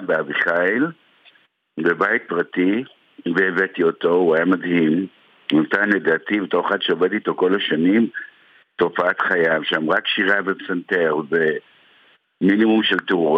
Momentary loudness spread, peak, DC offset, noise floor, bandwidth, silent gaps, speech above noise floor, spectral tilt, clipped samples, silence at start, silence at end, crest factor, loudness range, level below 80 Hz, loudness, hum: 7 LU; -4 dBFS; under 0.1%; -56 dBFS; 6 kHz; none; 37 dB; -7 dB/octave; under 0.1%; 0 s; 0 s; 16 dB; 2 LU; -70 dBFS; -19 LUFS; none